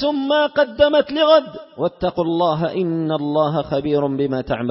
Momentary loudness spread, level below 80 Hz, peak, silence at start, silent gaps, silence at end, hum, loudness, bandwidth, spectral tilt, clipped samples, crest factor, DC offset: 7 LU; -48 dBFS; 0 dBFS; 0 s; none; 0 s; none; -18 LUFS; 5.8 kHz; -10 dB/octave; under 0.1%; 18 dB; under 0.1%